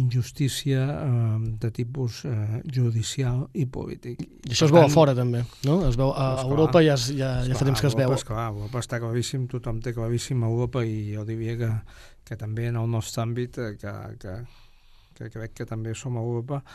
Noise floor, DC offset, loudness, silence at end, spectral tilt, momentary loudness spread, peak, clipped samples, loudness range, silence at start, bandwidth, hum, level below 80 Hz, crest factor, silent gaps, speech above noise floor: -53 dBFS; under 0.1%; -25 LUFS; 0 s; -6.5 dB/octave; 17 LU; -2 dBFS; under 0.1%; 11 LU; 0 s; 13 kHz; none; -42 dBFS; 22 dB; none; 28 dB